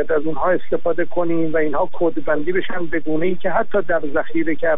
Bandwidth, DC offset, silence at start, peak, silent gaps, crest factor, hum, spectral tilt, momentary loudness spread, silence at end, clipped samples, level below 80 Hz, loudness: 3.9 kHz; 20%; 0 s; -6 dBFS; none; 14 dB; none; -9.5 dB/octave; 3 LU; 0 s; under 0.1%; -44 dBFS; -21 LUFS